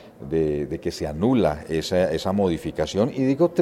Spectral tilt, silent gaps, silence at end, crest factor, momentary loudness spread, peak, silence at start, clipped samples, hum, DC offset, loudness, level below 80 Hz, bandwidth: -6.5 dB/octave; none; 0 s; 16 dB; 7 LU; -6 dBFS; 0 s; under 0.1%; none; under 0.1%; -23 LUFS; -46 dBFS; 15.5 kHz